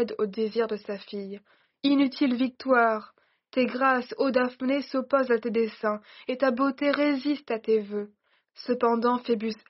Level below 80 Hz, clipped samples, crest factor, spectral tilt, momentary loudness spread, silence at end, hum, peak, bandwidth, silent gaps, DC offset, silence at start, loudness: -76 dBFS; under 0.1%; 18 dB; -3 dB/octave; 12 LU; 0.15 s; none; -8 dBFS; 6 kHz; none; under 0.1%; 0 s; -26 LUFS